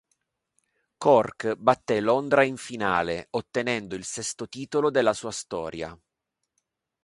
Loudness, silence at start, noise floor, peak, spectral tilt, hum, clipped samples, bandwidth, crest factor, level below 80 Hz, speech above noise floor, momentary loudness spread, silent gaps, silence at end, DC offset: -25 LUFS; 1 s; -83 dBFS; -4 dBFS; -4 dB/octave; none; under 0.1%; 11.5 kHz; 22 dB; -60 dBFS; 58 dB; 12 LU; none; 1.1 s; under 0.1%